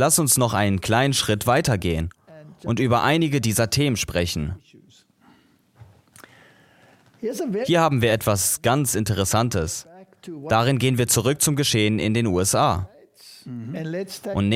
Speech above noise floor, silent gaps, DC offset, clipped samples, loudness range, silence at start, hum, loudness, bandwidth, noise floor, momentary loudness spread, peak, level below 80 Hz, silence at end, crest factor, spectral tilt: 36 dB; none; under 0.1%; under 0.1%; 7 LU; 0 s; none; -21 LUFS; 16.5 kHz; -57 dBFS; 14 LU; -4 dBFS; -46 dBFS; 0 s; 18 dB; -4 dB/octave